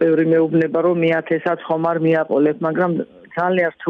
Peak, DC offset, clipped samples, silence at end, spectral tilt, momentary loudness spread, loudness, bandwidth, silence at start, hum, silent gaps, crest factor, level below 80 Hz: -6 dBFS; under 0.1%; under 0.1%; 0 s; -9.5 dB/octave; 5 LU; -18 LUFS; 4.6 kHz; 0 s; none; none; 10 dB; -66 dBFS